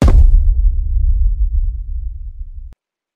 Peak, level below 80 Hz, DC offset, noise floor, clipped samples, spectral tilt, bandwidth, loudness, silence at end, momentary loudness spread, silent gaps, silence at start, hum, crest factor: 0 dBFS; -12 dBFS; under 0.1%; -40 dBFS; under 0.1%; -8 dB/octave; 3.8 kHz; -18 LUFS; 0.45 s; 20 LU; none; 0 s; none; 12 dB